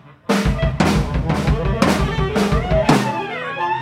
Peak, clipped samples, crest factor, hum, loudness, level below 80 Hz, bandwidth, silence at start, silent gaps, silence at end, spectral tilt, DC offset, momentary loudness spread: 0 dBFS; under 0.1%; 18 dB; none; -18 LUFS; -26 dBFS; 16 kHz; 0.05 s; none; 0 s; -6 dB/octave; under 0.1%; 6 LU